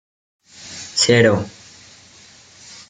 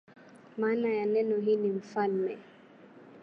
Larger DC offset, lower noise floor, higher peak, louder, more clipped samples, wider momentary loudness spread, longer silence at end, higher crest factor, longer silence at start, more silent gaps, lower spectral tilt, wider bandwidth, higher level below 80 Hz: neither; second, -46 dBFS vs -54 dBFS; first, -2 dBFS vs -16 dBFS; first, -16 LUFS vs -30 LUFS; neither; first, 26 LU vs 8 LU; first, 1.4 s vs 0 s; about the same, 20 dB vs 16 dB; first, 0.65 s vs 0.35 s; neither; second, -4 dB/octave vs -8 dB/octave; first, 9.6 kHz vs 6.8 kHz; first, -56 dBFS vs -82 dBFS